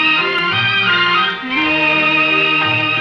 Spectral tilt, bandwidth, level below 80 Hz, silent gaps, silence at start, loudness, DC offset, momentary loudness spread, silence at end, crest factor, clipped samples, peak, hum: -5 dB/octave; 8.6 kHz; -52 dBFS; none; 0 s; -13 LUFS; under 0.1%; 3 LU; 0 s; 12 dB; under 0.1%; -4 dBFS; none